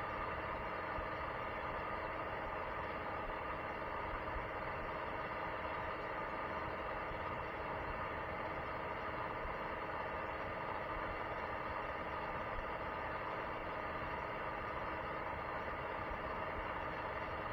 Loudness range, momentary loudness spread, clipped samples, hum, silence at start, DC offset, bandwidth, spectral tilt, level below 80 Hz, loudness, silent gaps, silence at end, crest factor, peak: 0 LU; 1 LU; under 0.1%; none; 0 s; under 0.1%; over 20 kHz; -7 dB/octave; -56 dBFS; -42 LUFS; none; 0 s; 14 dB; -28 dBFS